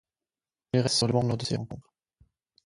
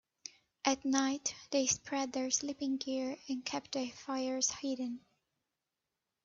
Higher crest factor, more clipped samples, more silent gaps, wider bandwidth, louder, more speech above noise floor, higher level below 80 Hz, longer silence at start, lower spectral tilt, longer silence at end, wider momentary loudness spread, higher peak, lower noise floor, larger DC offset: about the same, 20 dB vs 24 dB; neither; neither; first, 11.5 kHz vs 7.8 kHz; first, -27 LUFS vs -35 LUFS; first, over 63 dB vs 53 dB; first, -56 dBFS vs -76 dBFS; first, 0.75 s vs 0.25 s; first, -5 dB/octave vs -1.5 dB/octave; second, 0.85 s vs 1.25 s; first, 15 LU vs 8 LU; first, -10 dBFS vs -14 dBFS; about the same, under -90 dBFS vs -89 dBFS; neither